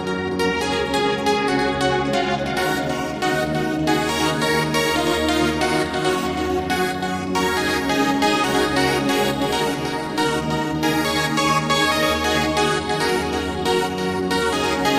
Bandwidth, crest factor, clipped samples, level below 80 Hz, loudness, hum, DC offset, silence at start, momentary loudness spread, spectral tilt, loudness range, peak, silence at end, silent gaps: 15.5 kHz; 16 dB; under 0.1%; -42 dBFS; -20 LUFS; none; under 0.1%; 0 s; 4 LU; -4 dB/octave; 1 LU; -4 dBFS; 0 s; none